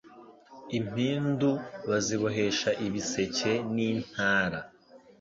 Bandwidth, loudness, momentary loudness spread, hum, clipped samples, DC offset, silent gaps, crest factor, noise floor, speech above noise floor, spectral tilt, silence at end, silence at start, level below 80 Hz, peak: 7.8 kHz; -29 LUFS; 7 LU; none; under 0.1%; under 0.1%; none; 18 dB; -53 dBFS; 24 dB; -4.5 dB/octave; 0.25 s; 0.05 s; -62 dBFS; -12 dBFS